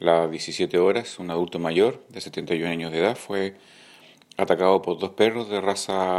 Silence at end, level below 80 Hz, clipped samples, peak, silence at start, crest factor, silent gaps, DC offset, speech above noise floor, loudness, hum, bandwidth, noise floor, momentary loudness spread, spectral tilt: 0 s; -66 dBFS; under 0.1%; -4 dBFS; 0 s; 20 dB; none; under 0.1%; 28 dB; -24 LUFS; none; 14 kHz; -51 dBFS; 9 LU; -4.5 dB/octave